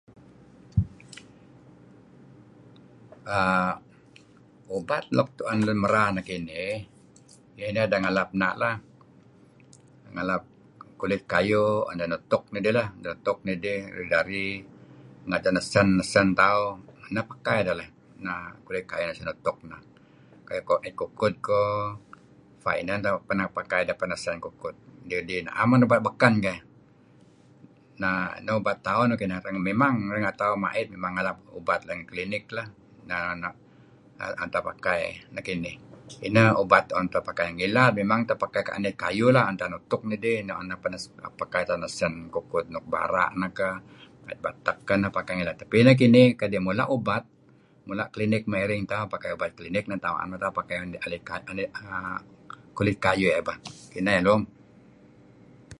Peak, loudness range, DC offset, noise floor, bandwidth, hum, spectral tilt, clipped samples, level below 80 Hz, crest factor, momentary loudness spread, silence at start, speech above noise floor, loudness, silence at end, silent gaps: -2 dBFS; 9 LU; under 0.1%; -57 dBFS; 11.5 kHz; none; -6.5 dB/octave; under 0.1%; -54 dBFS; 26 dB; 15 LU; 0.75 s; 32 dB; -26 LUFS; 0.05 s; none